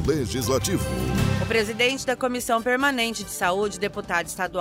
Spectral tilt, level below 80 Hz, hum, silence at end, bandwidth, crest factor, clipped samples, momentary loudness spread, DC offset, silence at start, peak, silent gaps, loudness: -4 dB/octave; -40 dBFS; none; 0 s; 16 kHz; 16 dB; under 0.1%; 5 LU; under 0.1%; 0 s; -8 dBFS; none; -24 LUFS